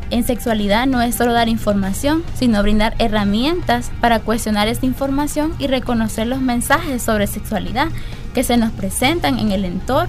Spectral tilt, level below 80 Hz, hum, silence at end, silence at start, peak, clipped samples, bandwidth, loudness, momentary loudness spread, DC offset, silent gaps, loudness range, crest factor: -5 dB/octave; -26 dBFS; none; 0 s; 0 s; -2 dBFS; under 0.1%; 16 kHz; -18 LUFS; 5 LU; under 0.1%; none; 2 LU; 14 dB